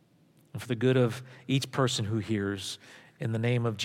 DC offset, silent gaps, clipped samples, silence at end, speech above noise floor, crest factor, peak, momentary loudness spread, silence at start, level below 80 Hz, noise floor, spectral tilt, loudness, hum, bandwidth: under 0.1%; none; under 0.1%; 0 s; 34 dB; 18 dB; -12 dBFS; 15 LU; 0.55 s; -72 dBFS; -63 dBFS; -5.5 dB/octave; -30 LUFS; none; 15.5 kHz